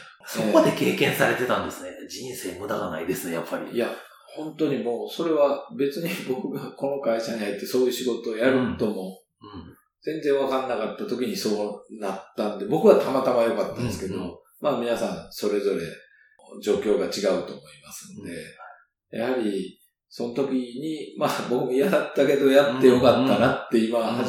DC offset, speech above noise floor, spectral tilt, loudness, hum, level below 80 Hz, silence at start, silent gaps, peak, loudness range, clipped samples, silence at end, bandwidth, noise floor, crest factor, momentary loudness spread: under 0.1%; 26 dB; -5 dB/octave; -24 LUFS; none; -62 dBFS; 0 s; none; -4 dBFS; 8 LU; under 0.1%; 0 s; 18 kHz; -50 dBFS; 22 dB; 18 LU